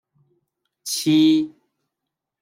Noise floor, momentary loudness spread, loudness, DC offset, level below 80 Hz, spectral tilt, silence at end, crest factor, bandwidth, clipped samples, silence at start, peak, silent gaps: -83 dBFS; 16 LU; -19 LUFS; under 0.1%; -72 dBFS; -4.5 dB/octave; 0.95 s; 14 dB; 16 kHz; under 0.1%; 0.85 s; -8 dBFS; none